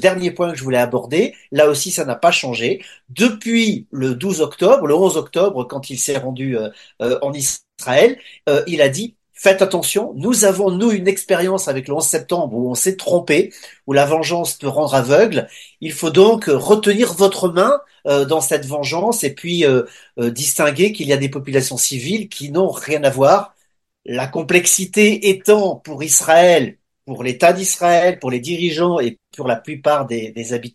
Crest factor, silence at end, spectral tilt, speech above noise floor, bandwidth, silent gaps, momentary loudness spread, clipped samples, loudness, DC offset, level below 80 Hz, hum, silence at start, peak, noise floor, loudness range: 16 dB; 0.05 s; -3.5 dB/octave; 49 dB; 13 kHz; none; 11 LU; under 0.1%; -16 LUFS; under 0.1%; -62 dBFS; none; 0 s; 0 dBFS; -65 dBFS; 4 LU